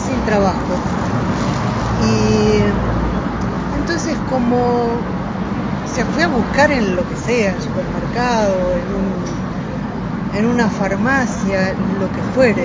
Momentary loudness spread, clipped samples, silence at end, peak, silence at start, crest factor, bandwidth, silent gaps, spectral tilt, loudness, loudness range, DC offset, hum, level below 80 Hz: 7 LU; under 0.1%; 0 s; 0 dBFS; 0 s; 16 dB; 7.6 kHz; none; -6 dB/octave; -17 LUFS; 2 LU; under 0.1%; none; -30 dBFS